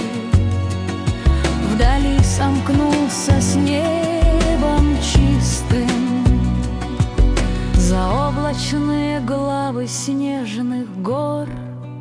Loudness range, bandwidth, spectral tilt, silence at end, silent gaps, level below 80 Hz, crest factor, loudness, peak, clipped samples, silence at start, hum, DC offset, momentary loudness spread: 4 LU; 10.5 kHz; -6 dB/octave; 0 s; none; -22 dBFS; 14 dB; -18 LUFS; -4 dBFS; under 0.1%; 0 s; none; under 0.1%; 7 LU